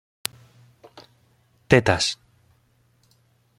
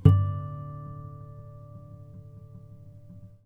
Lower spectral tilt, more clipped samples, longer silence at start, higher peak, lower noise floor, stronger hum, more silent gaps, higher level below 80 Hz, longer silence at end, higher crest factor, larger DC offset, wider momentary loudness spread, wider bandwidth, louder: second, -4.5 dB/octave vs -10.5 dB/octave; neither; first, 1.7 s vs 0 s; about the same, 0 dBFS vs -2 dBFS; first, -63 dBFS vs -48 dBFS; neither; neither; about the same, -52 dBFS vs -48 dBFS; first, 1.45 s vs 0.2 s; about the same, 26 dB vs 26 dB; neither; second, 15 LU vs 20 LU; first, 16.5 kHz vs 3.1 kHz; first, -21 LUFS vs -30 LUFS